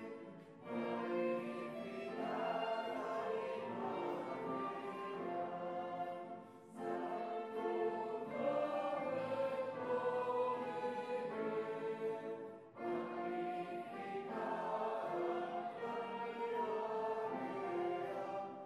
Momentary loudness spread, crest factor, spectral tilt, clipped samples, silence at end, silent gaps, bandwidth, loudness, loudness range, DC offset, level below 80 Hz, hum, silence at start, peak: 7 LU; 16 dB; -6.5 dB/octave; under 0.1%; 0 s; none; 12.5 kHz; -42 LUFS; 4 LU; under 0.1%; under -90 dBFS; none; 0 s; -26 dBFS